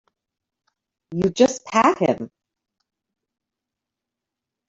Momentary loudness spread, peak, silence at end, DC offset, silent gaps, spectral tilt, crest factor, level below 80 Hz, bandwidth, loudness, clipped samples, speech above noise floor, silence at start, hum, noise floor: 13 LU; -2 dBFS; 2.4 s; under 0.1%; none; -5 dB/octave; 22 dB; -60 dBFS; 8 kHz; -20 LUFS; under 0.1%; 66 dB; 1.1 s; none; -85 dBFS